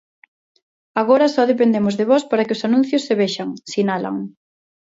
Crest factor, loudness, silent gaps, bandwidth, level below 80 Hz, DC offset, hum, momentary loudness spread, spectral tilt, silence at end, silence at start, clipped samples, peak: 18 dB; -18 LUFS; none; 7.8 kHz; -66 dBFS; under 0.1%; none; 11 LU; -5.5 dB/octave; 0.6 s; 0.95 s; under 0.1%; -2 dBFS